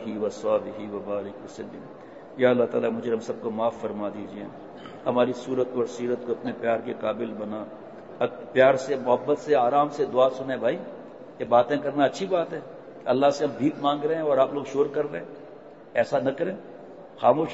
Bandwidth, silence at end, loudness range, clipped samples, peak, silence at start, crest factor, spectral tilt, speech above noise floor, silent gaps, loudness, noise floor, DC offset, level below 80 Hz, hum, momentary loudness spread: 8 kHz; 0 s; 5 LU; under 0.1%; -6 dBFS; 0 s; 20 dB; -6 dB/octave; 20 dB; none; -25 LUFS; -45 dBFS; 0.1%; -70 dBFS; none; 20 LU